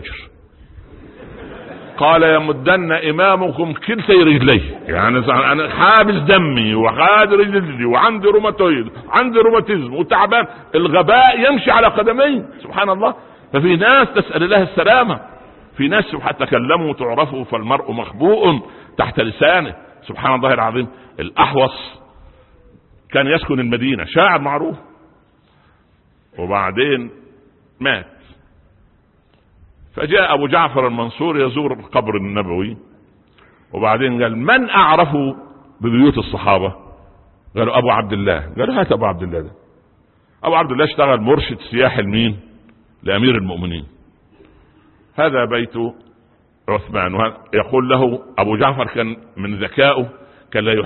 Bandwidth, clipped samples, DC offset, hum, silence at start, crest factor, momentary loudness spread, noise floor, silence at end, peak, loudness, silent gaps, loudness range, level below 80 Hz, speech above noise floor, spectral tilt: 4.3 kHz; under 0.1%; under 0.1%; none; 0 s; 16 dB; 14 LU; -55 dBFS; 0 s; 0 dBFS; -15 LUFS; none; 8 LU; -42 dBFS; 40 dB; -9.5 dB/octave